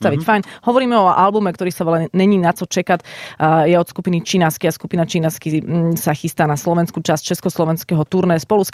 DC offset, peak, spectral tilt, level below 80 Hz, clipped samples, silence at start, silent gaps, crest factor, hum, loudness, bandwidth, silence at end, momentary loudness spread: under 0.1%; -2 dBFS; -6 dB/octave; -54 dBFS; under 0.1%; 0 s; none; 14 dB; none; -17 LUFS; 16 kHz; 0.05 s; 7 LU